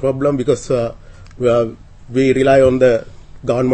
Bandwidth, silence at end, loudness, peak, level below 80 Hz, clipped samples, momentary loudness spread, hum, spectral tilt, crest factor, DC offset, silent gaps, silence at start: 8.8 kHz; 0 s; -15 LUFS; 0 dBFS; -40 dBFS; under 0.1%; 12 LU; none; -7 dB/octave; 14 dB; under 0.1%; none; 0 s